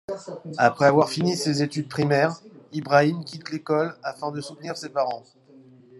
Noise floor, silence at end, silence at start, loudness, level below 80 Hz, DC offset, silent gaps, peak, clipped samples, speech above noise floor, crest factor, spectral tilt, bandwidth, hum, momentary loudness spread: -51 dBFS; 0.8 s; 0.1 s; -24 LUFS; -68 dBFS; under 0.1%; none; -4 dBFS; under 0.1%; 28 dB; 22 dB; -5.5 dB/octave; 12.5 kHz; none; 16 LU